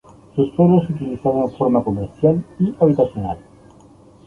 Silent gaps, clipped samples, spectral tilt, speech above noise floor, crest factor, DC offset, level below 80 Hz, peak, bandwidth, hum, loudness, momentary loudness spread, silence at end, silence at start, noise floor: none; under 0.1%; -11 dB/octave; 29 dB; 16 dB; under 0.1%; -46 dBFS; -2 dBFS; 3.6 kHz; none; -18 LUFS; 12 LU; 0.85 s; 0.35 s; -47 dBFS